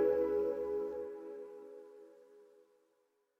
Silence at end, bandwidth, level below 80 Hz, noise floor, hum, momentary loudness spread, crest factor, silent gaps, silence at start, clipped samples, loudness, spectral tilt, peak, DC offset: 0.95 s; 15 kHz; -70 dBFS; -78 dBFS; none; 24 LU; 18 dB; none; 0 s; under 0.1%; -37 LUFS; -7.5 dB/octave; -22 dBFS; under 0.1%